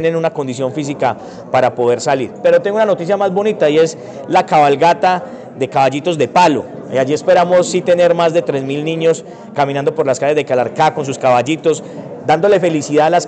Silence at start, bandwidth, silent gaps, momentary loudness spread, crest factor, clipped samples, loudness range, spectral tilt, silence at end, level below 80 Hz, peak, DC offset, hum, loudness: 0 s; 9 kHz; none; 8 LU; 12 dB; under 0.1%; 2 LU; -5 dB/octave; 0 s; -62 dBFS; -2 dBFS; under 0.1%; none; -14 LUFS